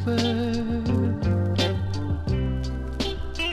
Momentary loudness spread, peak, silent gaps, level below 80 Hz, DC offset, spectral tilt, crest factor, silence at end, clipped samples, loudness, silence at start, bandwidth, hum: 5 LU; -10 dBFS; none; -34 dBFS; under 0.1%; -6.5 dB/octave; 16 dB; 0 s; under 0.1%; -26 LUFS; 0 s; 11.5 kHz; none